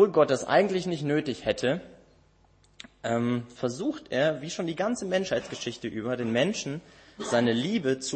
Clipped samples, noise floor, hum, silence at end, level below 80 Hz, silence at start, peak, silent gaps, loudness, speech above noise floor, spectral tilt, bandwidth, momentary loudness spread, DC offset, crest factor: under 0.1%; -62 dBFS; none; 0 s; -62 dBFS; 0 s; -8 dBFS; none; -28 LUFS; 34 dB; -5 dB/octave; 8.8 kHz; 11 LU; under 0.1%; 20 dB